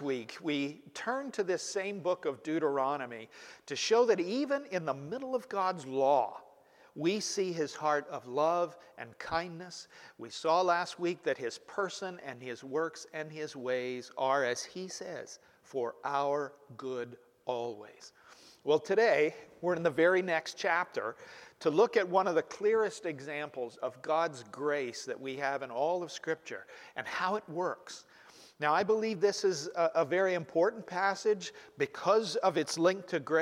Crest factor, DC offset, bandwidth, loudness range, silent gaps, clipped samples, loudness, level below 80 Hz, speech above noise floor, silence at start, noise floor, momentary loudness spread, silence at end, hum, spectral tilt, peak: 18 dB; under 0.1%; 13.5 kHz; 6 LU; none; under 0.1%; -33 LUFS; -78 dBFS; 28 dB; 0 s; -61 dBFS; 15 LU; 0 s; none; -4 dB/octave; -14 dBFS